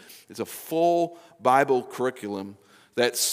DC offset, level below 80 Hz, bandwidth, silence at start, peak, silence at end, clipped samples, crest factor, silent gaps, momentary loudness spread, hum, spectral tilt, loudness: under 0.1%; -82 dBFS; 16 kHz; 0.1 s; -6 dBFS; 0 s; under 0.1%; 20 dB; none; 14 LU; none; -3 dB/octave; -25 LUFS